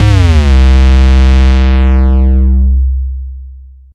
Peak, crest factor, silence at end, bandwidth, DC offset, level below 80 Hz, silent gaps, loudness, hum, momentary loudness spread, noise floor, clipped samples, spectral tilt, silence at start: 0 dBFS; 6 dB; 0.35 s; 7.2 kHz; under 0.1%; -8 dBFS; none; -9 LUFS; none; 13 LU; -31 dBFS; under 0.1%; -7.5 dB/octave; 0 s